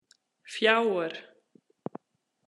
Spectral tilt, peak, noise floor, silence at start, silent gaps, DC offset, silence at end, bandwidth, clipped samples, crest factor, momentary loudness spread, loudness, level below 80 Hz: -4 dB/octave; -8 dBFS; -78 dBFS; 0.45 s; none; under 0.1%; 1.25 s; 11.5 kHz; under 0.1%; 24 dB; 20 LU; -26 LUFS; under -90 dBFS